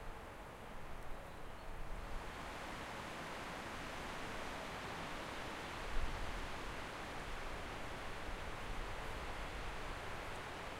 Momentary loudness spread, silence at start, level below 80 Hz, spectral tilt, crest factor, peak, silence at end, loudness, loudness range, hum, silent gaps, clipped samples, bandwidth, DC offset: 7 LU; 0 s; -50 dBFS; -4 dB/octave; 20 dB; -26 dBFS; 0 s; -47 LUFS; 3 LU; none; none; under 0.1%; 16 kHz; under 0.1%